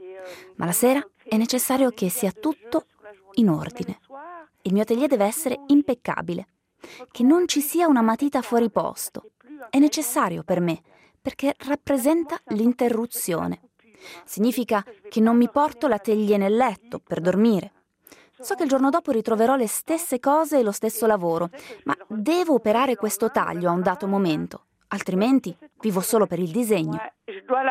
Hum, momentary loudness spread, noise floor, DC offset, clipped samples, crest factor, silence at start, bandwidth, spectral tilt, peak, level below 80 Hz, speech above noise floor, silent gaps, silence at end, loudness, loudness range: none; 14 LU; -53 dBFS; under 0.1%; under 0.1%; 16 dB; 0 s; 16 kHz; -5 dB/octave; -6 dBFS; -64 dBFS; 31 dB; none; 0 s; -23 LUFS; 3 LU